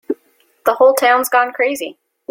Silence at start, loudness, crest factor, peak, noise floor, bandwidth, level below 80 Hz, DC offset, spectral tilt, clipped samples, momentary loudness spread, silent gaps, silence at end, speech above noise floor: 0.1 s; -14 LUFS; 14 dB; -2 dBFS; -57 dBFS; 17 kHz; -64 dBFS; under 0.1%; -1 dB/octave; under 0.1%; 16 LU; none; 0.4 s; 43 dB